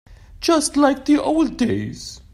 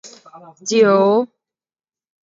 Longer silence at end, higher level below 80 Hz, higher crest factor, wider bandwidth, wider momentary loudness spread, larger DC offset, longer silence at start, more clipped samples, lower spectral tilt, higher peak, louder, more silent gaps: second, 0.15 s vs 1 s; first, -44 dBFS vs -70 dBFS; about the same, 16 dB vs 16 dB; first, 14 kHz vs 7.8 kHz; second, 10 LU vs 17 LU; neither; about the same, 0.1 s vs 0.05 s; neither; about the same, -4.5 dB/octave vs -5 dB/octave; about the same, -4 dBFS vs -2 dBFS; second, -19 LUFS vs -15 LUFS; neither